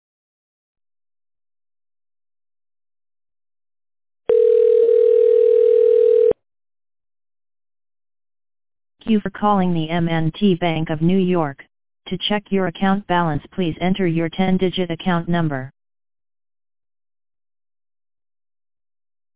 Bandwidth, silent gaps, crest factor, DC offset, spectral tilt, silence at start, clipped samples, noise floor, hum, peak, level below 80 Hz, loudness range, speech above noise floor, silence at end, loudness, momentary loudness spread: 4 kHz; none; 16 dB; under 0.1%; -11 dB/octave; 0.75 s; under 0.1%; under -90 dBFS; none; -4 dBFS; -52 dBFS; 10 LU; over 71 dB; 0 s; -18 LUFS; 10 LU